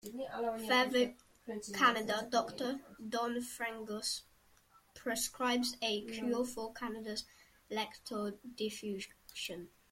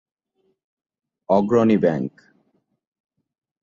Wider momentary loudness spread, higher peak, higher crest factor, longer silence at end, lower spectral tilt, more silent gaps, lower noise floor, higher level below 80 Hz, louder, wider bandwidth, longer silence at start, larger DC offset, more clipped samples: about the same, 13 LU vs 11 LU; second, -16 dBFS vs -4 dBFS; about the same, 22 dB vs 20 dB; second, 0.25 s vs 1.55 s; second, -2.5 dB/octave vs -8.5 dB/octave; neither; about the same, -67 dBFS vs -70 dBFS; second, -70 dBFS vs -62 dBFS; second, -37 LUFS vs -19 LUFS; first, 16.5 kHz vs 7.2 kHz; second, 0.05 s vs 1.3 s; neither; neither